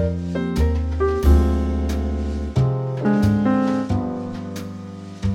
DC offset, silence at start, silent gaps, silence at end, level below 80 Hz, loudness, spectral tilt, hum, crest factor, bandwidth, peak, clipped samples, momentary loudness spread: under 0.1%; 0 s; none; 0 s; -24 dBFS; -21 LUFS; -8 dB/octave; none; 16 dB; 13 kHz; -4 dBFS; under 0.1%; 13 LU